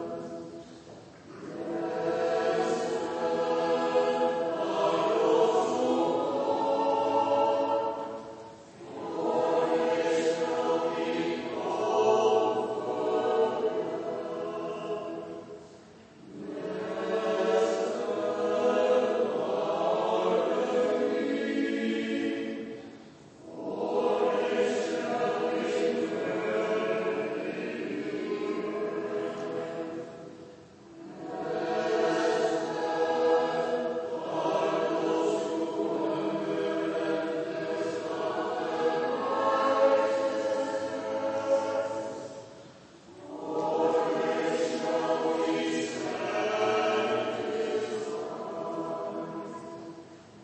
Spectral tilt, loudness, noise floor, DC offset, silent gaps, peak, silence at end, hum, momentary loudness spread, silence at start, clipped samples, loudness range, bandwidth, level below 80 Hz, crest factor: -5 dB/octave; -29 LUFS; -52 dBFS; under 0.1%; none; -12 dBFS; 0 s; none; 15 LU; 0 s; under 0.1%; 6 LU; 8.8 kHz; -74 dBFS; 18 dB